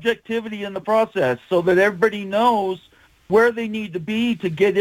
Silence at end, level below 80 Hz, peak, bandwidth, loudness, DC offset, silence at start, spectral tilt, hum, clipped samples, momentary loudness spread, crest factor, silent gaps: 0 s; -58 dBFS; -4 dBFS; 17 kHz; -20 LUFS; under 0.1%; 0 s; -6 dB/octave; none; under 0.1%; 10 LU; 16 dB; none